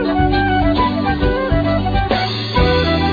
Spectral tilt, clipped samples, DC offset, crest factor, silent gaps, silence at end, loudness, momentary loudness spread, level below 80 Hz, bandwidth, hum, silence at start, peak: -7.5 dB/octave; under 0.1%; under 0.1%; 14 dB; none; 0 s; -16 LUFS; 3 LU; -24 dBFS; 5 kHz; none; 0 s; -2 dBFS